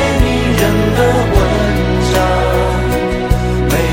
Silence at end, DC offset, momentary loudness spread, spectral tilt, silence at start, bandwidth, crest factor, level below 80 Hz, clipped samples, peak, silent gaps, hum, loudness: 0 s; under 0.1%; 3 LU; -6 dB/octave; 0 s; 17 kHz; 12 dB; -18 dBFS; under 0.1%; 0 dBFS; none; none; -13 LUFS